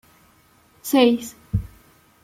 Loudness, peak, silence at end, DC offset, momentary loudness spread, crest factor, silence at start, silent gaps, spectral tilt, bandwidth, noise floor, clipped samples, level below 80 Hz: -21 LUFS; -4 dBFS; 0.55 s; under 0.1%; 18 LU; 20 dB; 0.85 s; none; -5.5 dB/octave; 16 kHz; -57 dBFS; under 0.1%; -42 dBFS